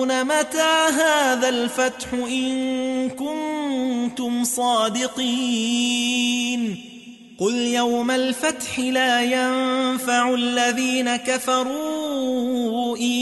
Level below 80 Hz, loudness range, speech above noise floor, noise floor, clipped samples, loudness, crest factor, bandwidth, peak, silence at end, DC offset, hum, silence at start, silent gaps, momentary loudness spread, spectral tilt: -62 dBFS; 3 LU; 21 dB; -42 dBFS; under 0.1%; -21 LUFS; 16 dB; 12 kHz; -6 dBFS; 0 s; under 0.1%; none; 0 s; none; 7 LU; -2 dB/octave